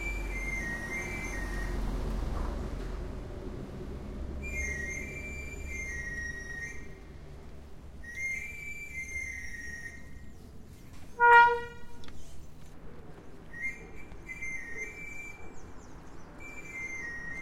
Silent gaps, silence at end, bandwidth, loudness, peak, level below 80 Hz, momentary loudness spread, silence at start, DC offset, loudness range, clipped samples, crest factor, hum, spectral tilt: none; 0 s; 16 kHz; -32 LUFS; -8 dBFS; -42 dBFS; 17 LU; 0 s; under 0.1%; 13 LU; under 0.1%; 26 dB; none; -4.5 dB/octave